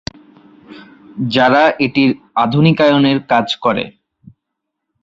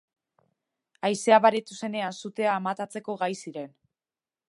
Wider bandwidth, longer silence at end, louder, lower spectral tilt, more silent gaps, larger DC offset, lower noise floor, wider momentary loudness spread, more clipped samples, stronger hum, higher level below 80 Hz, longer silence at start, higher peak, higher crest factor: second, 7.6 kHz vs 11.5 kHz; first, 1.15 s vs 0.8 s; first, -13 LUFS vs -26 LUFS; first, -7 dB/octave vs -4 dB/octave; neither; neither; second, -77 dBFS vs under -90 dBFS; second, 13 LU vs 17 LU; neither; neither; first, -52 dBFS vs -84 dBFS; second, 0.7 s vs 1.05 s; first, 0 dBFS vs -4 dBFS; second, 16 dB vs 24 dB